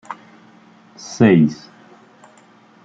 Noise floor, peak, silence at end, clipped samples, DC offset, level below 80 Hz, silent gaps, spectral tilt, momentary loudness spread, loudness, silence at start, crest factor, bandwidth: -49 dBFS; -2 dBFS; 1.3 s; under 0.1%; under 0.1%; -58 dBFS; none; -7 dB/octave; 24 LU; -15 LUFS; 0.1 s; 18 dB; 7.8 kHz